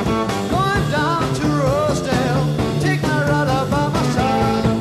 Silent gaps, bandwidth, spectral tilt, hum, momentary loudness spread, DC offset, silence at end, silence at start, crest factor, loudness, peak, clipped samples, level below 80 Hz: none; 14.5 kHz; -6 dB/octave; none; 2 LU; under 0.1%; 0 s; 0 s; 14 dB; -18 LUFS; -4 dBFS; under 0.1%; -34 dBFS